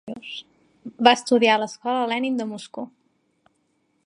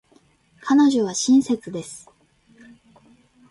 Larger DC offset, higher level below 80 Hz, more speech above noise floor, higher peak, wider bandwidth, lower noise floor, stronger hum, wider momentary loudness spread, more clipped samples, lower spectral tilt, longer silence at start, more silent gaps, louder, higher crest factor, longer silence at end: neither; second, -74 dBFS vs -66 dBFS; first, 47 dB vs 39 dB; first, 0 dBFS vs -8 dBFS; about the same, 11 kHz vs 11.5 kHz; first, -69 dBFS vs -58 dBFS; neither; about the same, 20 LU vs 20 LU; neither; about the same, -3.5 dB/octave vs -4 dB/octave; second, 0.05 s vs 0.65 s; neither; about the same, -21 LUFS vs -19 LUFS; first, 24 dB vs 14 dB; second, 1.15 s vs 1.5 s